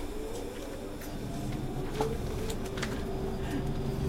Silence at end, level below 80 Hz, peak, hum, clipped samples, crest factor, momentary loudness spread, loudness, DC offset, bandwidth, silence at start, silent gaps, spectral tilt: 0 s; -40 dBFS; -14 dBFS; none; under 0.1%; 20 dB; 7 LU; -36 LUFS; under 0.1%; 16 kHz; 0 s; none; -6 dB/octave